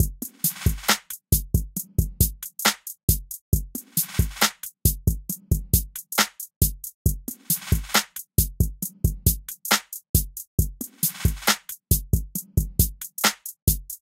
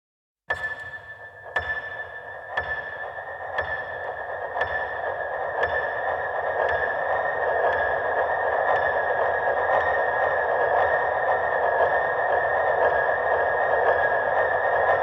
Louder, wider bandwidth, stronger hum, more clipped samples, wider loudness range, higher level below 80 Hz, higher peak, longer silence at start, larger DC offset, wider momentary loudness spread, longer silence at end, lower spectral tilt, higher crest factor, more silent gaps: about the same, -24 LUFS vs -24 LUFS; first, 17 kHz vs 7.8 kHz; neither; neither; second, 1 LU vs 8 LU; first, -30 dBFS vs -54 dBFS; first, -2 dBFS vs -8 dBFS; second, 0 s vs 0.5 s; neither; second, 5 LU vs 10 LU; first, 0.15 s vs 0 s; second, -3 dB/octave vs -5.5 dB/octave; first, 22 dB vs 16 dB; first, 3.03-3.08 s, 3.41-3.52 s, 6.56-6.61 s, 6.94-7.05 s, 10.09-10.14 s, 10.47-10.58 s, 13.62-13.67 s vs none